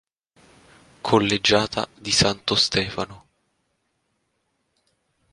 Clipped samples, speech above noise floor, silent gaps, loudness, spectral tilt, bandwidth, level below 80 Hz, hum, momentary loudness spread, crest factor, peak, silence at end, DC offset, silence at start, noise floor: under 0.1%; 51 dB; none; -20 LUFS; -3.5 dB/octave; 11.5 kHz; -50 dBFS; none; 12 LU; 24 dB; -2 dBFS; 2.15 s; under 0.1%; 1.05 s; -73 dBFS